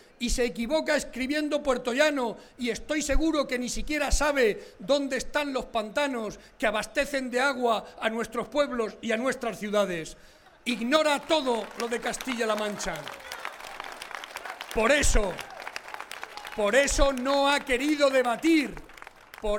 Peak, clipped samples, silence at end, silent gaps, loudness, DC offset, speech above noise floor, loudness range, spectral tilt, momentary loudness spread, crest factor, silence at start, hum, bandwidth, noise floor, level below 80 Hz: -8 dBFS; under 0.1%; 0 s; none; -27 LUFS; under 0.1%; 21 dB; 5 LU; -3 dB/octave; 14 LU; 20 dB; 0.2 s; none; 17 kHz; -48 dBFS; -38 dBFS